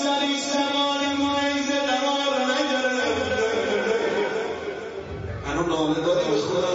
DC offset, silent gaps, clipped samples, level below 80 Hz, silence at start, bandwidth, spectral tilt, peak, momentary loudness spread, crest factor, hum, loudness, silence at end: under 0.1%; none; under 0.1%; -50 dBFS; 0 s; 8 kHz; -3.5 dB/octave; -10 dBFS; 9 LU; 12 dB; none; -23 LUFS; 0 s